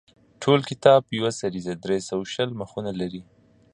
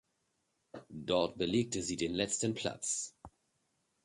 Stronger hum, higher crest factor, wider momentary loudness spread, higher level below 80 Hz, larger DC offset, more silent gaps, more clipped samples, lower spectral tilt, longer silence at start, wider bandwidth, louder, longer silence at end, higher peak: neither; about the same, 22 dB vs 20 dB; about the same, 14 LU vs 14 LU; about the same, -60 dBFS vs -64 dBFS; neither; neither; neither; first, -5.5 dB/octave vs -3.5 dB/octave; second, 0.4 s vs 0.75 s; about the same, 11 kHz vs 11.5 kHz; first, -24 LUFS vs -35 LUFS; second, 0.5 s vs 0.75 s; first, -2 dBFS vs -18 dBFS